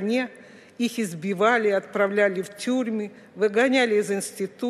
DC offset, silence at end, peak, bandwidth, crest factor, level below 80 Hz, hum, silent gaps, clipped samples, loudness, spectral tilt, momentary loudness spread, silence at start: under 0.1%; 0 s; -6 dBFS; 14 kHz; 18 dB; -78 dBFS; none; none; under 0.1%; -24 LUFS; -4.5 dB/octave; 10 LU; 0 s